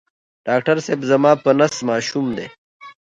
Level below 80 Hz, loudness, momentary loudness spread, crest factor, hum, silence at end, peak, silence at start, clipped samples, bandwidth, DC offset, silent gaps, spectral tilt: -60 dBFS; -18 LUFS; 13 LU; 18 dB; none; 0.15 s; 0 dBFS; 0.45 s; under 0.1%; 9.2 kHz; under 0.1%; 2.58-2.80 s; -5 dB/octave